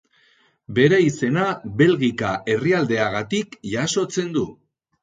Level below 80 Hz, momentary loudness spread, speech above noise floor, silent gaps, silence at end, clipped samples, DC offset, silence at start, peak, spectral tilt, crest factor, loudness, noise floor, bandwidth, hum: -56 dBFS; 9 LU; 39 dB; none; 0.5 s; under 0.1%; under 0.1%; 0.7 s; -4 dBFS; -5.5 dB/octave; 18 dB; -21 LUFS; -59 dBFS; 9.4 kHz; none